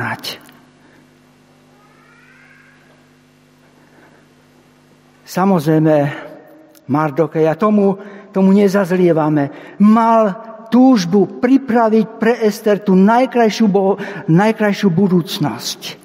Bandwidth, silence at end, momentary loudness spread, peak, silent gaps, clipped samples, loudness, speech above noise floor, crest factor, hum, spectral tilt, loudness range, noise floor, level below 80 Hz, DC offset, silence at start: 16 kHz; 0.1 s; 12 LU; 0 dBFS; none; under 0.1%; -14 LUFS; 36 dB; 14 dB; none; -7 dB/octave; 6 LU; -50 dBFS; -64 dBFS; under 0.1%; 0 s